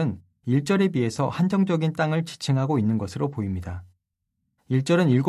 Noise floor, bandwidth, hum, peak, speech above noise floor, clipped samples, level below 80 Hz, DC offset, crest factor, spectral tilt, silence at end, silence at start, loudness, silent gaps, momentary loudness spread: -79 dBFS; 13 kHz; none; -10 dBFS; 56 dB; under 0.1%; -48 dBFS; under 0.1%; 14 dB; -7 dB/octave; 0 s; 0 s; -24 LUFS; none; 9 LU